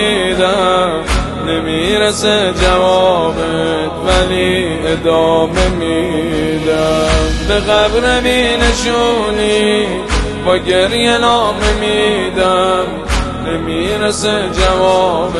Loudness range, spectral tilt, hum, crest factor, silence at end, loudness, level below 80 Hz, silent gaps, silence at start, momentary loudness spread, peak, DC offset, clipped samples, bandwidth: 1 LU; -4.5 dB/octave; none; 12 dB; 0 s; -13 LUFS; -24 dBFS; none; 0 s; 5 LU; 0 dBFS; under 0.1%; under 0.1%; 12.5 kHz